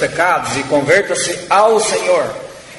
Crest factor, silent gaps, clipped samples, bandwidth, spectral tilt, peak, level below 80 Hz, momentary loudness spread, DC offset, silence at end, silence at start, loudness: 14 dB; none; under 0.1%; 12 kHz; -3 dB/octave; 0 dBFS; -50 dBFS; 6 LU; under 0.1%; 0 s; 0 s; -14 LUFS